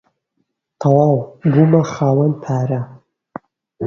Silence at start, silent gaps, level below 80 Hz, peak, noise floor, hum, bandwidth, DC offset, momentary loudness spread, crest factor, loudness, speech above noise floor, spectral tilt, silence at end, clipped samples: 0.8 s; none; -54 dBFS; 0 dBFS; -70 dBFS; none; 7 kHz; under 0.1%; 24 LU; 16 dB; -16 LUFS; 56 dB; -9 dB/octave; 0 s; under 0.1%